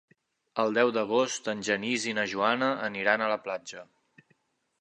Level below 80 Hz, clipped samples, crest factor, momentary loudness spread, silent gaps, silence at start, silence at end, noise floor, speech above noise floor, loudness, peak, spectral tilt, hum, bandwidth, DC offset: -76 dBFS; under 0.1%; 22 dB; 12 LU; none; 0.55 s; 1 s; -71 dBFS; 43 dB; -28 LUFS; -8 dBFS; -3 dB/octave; none; 11 kHz; under 0.1%